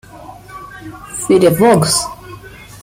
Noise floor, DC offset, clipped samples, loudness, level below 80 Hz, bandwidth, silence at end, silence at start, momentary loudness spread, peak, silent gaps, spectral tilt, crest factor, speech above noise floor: -35 dBFS; under 0.1%; under 0.1%; -12 LUFS; -44 dBFS; 16.5 kHz; 0.05 s; 0.15 s; 24 LU; 0 dBFS; none; -4.5 dB/octave; 14 dB; 23 dB